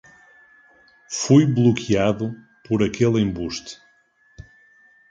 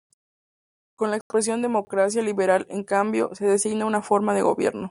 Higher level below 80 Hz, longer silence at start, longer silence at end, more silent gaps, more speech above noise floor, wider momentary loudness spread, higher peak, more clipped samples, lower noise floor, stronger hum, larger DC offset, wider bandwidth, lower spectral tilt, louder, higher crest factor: first, -50 dBFS vs -68 dBFS; about the same, 1.1 s vs 1 s; first, 0.7 s vs 0.1 s; second, none vs 1.21-1.30 s; second, 40 dB vs over 67 dB; first, 15 LU vs 4 LU; about the same, -4 dBFS vs -6 dBFS; neither; second, -59 dBFS vs under -90 dBFS; neither; neither; second, 9.2 kHz vs 11.5 kHz; first, -6 dB/octave vs -4.5 dB/octave; first, -20 LUFS vs -23 LUFS; about the same, 18 dB vs 18 dB